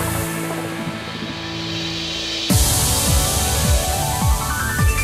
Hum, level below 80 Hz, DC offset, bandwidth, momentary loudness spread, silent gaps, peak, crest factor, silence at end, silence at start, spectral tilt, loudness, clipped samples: none; -26 dBFS; under 0.1%; 16.5 kHz; 11 LU; none; -4 dBFS; 14 dB; 0 s; 0 s; -3.5 dB/octave; -19 LUFS; under 0.1%